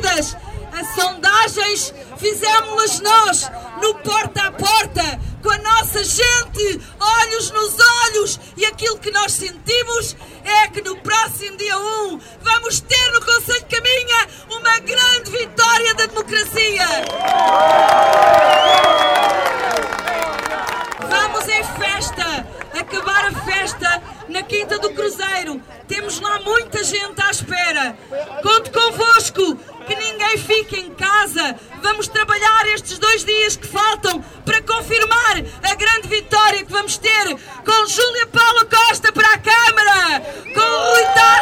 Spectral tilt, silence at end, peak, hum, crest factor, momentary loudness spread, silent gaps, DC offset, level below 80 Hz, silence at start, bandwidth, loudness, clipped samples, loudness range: -1 dB/octave; 0 s; -2 dBFS; none; 14 dB; 11 LU; none; under 0.1%; -42 dBFS; 0 s; 17.5 kHz; -15 LUFS; under 0.1%; 7 LU